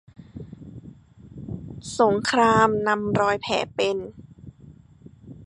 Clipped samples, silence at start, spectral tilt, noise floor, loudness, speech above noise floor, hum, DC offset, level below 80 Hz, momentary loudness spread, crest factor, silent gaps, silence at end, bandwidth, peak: under 0.1%; 0.2 s; -5 dB/octave; -49 dBFS; -22 LUFS; 28 dB; none; under 0.1%; -52 dBFS; 23 LU; 22 dB; none; 0 s; 11 kHz; -4 dBFS